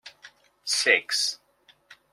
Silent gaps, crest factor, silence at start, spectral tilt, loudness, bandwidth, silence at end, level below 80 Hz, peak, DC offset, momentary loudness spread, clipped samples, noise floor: none; 24 dB; 0.05 s; 1.5 dB/octave; -23 LUFS; 16 kHz; 0.8 s; -82 dBFS; -6 dBFS; under 0.1%; 17 LU; under 0.1%; -61 dBFS